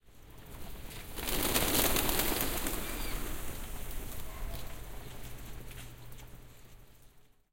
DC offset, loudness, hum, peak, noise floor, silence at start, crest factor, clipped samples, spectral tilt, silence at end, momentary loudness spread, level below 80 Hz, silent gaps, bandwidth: under 0.1%; -33 LUFS; none; -10 dBFS; -59 dBFS; 0.05 s; 26 dB; under 0.1%; -2.5 dB/octave; 0.3 s; 23 LU; -42 dBFS; none; 17 kHz